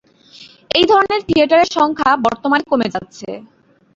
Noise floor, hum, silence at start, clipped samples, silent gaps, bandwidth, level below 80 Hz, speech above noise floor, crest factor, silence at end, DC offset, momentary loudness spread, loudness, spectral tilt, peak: -43 dBFS; none; 0.4 s; under 0.1%; none; 7.8 kHz; -52 dBFS; 28 dB; 14 dB; 0.55 s; under 0.1%; 18 LU; -14 LUFS; -4.5 dB/octave; -2 dBFS